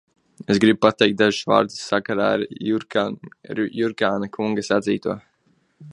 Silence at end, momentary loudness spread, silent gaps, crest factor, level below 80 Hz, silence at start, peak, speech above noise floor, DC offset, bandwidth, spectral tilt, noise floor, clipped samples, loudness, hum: 0 s; 11 LU; none; 22 dB; -60 dBFS; 0.5 s; 0 dBFS; 43 dB; under 0.1%; 11.5 kHz; -5 dB/octave; -64 dBFS; under 0.1%; -21 LUFS; none